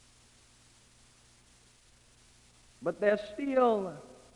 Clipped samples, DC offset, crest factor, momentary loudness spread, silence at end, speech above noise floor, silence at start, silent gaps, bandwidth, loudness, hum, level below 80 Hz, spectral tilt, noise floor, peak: under 0.1%; under 0.1%; 20 dB; 13 LU; 0.25 s; 33 dB; 2.8 s; none; 11.5 kHz; -31 LUFS; 60 Hz at -70 dBFS; -68 dBFS; -6 dB/octave; -62 dBFS; -14 dBFS